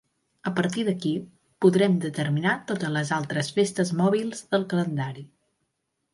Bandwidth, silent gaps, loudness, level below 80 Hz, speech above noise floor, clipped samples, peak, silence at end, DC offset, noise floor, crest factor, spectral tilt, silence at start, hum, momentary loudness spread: 11.5 kHz; none; -25 LUFS; -68 dBFS; 53 dB; under 0.1%; -6 dBFS; 0.9 s; under 0.1%; -78 dBFS; 18 dB; -6 dB/octave; 0.45 s; none; 8 LU